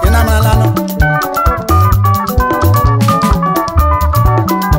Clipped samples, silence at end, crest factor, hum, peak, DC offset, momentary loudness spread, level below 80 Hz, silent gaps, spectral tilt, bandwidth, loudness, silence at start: under 0.1%; 0 s; 8 dB; none; 0 dBFS; under 0.1%; 3 LU; -16 dBFS; none; -6.5 dB/octave; 16.5 kHz; -11 LUFS; 0 s